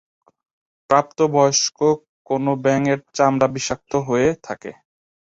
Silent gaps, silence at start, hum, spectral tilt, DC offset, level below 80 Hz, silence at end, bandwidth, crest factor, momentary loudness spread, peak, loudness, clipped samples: 2.09-2.25 s; 0.9 s; none; -4.5 dB/octave; under 0.1%; -54 dBFS; 0.65 s; 8 kHz; 18 dB; 9 LU; -2 dBFS; -19 LUFS; under 0.1%